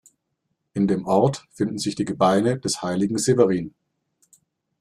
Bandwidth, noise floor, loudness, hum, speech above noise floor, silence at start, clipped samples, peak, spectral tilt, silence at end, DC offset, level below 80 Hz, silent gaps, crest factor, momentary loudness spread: 14 kHz; -76 dBFS; -22 LUFS; none; 55 dB; 0.75 s; under 0.1%; -2 dBFS; -5.5 dB/octave; 1.1 s; under 0.1%; -58 dBFS; none; 20 dB; 9 LU